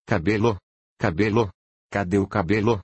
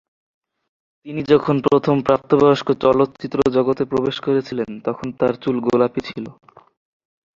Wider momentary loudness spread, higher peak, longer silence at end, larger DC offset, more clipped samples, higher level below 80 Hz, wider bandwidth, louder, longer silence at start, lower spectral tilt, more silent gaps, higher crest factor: second, 8 LU vs 12 LU; second, -6 dBFS vs 0 dBFS; second, 0 s vs 1.1 s; neither; neither; first, -48 dBFS vs -54 dBFS; first, 8.6 kHz vs 7.4 kHz; second, -23 LUFS vs -18 LUFS; second, 0.1 s vs 1.05 s; about the same, -7.5 dB/octave vs -7.5 dB/octave; first, 0.63-0.96 s, 1.54-1.89 s vs none; about the same, 16 dB vs 18 dB